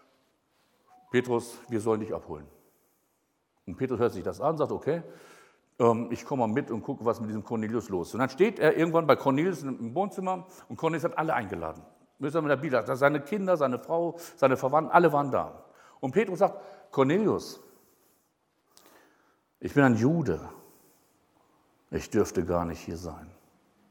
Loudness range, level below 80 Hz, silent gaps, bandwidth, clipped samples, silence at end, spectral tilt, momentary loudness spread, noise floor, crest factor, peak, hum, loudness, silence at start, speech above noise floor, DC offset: 7 LU; -60 dBFS; none; 17.5 kHz; under 0.1%; 0.6 s; -7 dB/octave; 14 LU; -74 dBFS; 24 dB; -6 dBFS; none; -28 LUFS; 1.15 s; 47 dB; under 0.1%